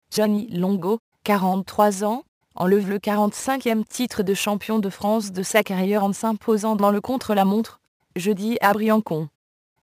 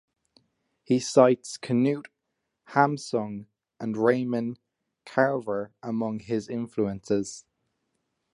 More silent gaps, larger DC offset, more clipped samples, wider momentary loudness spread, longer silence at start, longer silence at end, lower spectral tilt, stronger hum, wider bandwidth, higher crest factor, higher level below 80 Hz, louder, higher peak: first, 0.99-1.12 s, 2.28-2.41 s, 7.88-8.00 s vs none; neither; neither; second, 6 LU vs 14 LU; second, 0.1 s vs 0.9 s; second, 0.55 s vs 0.95 s; about the same, -5.5 dB/octave vs -6 dB/octave; neither; first, 15.5 kHz vs 11.5 kHz; about the same, 20 dB vs 24 dB; about the same, -62 dBFS vs -66 dBFS; first, -22 LUFS vs -27 LUFS; about the same, -2 dBFS vs -4 dBFS